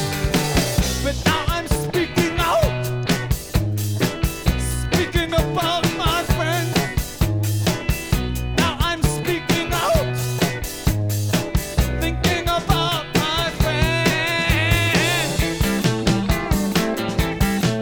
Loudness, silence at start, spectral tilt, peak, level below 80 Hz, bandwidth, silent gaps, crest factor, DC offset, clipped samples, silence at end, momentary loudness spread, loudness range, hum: -20 LUFS; 0 s; -4.5 dB/octave; -4 dBFS; -28 dBFS; over 20 kHz; none; 16 dB; under 0.1%; under 0.1%; 0 s; 4 LU; 3 LU; none